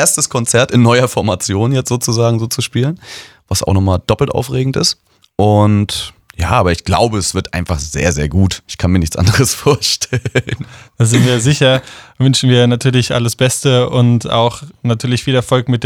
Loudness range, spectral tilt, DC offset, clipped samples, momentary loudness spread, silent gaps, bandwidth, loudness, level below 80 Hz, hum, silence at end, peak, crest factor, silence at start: 3 LU; -5 dB/octave; under 0.1%; under 0.1%; 8 LU; none; 16.5 kHz; -13 LUFS; -34 dBFS; none; 0 s; 0 dBFS; 14 dB; 0 s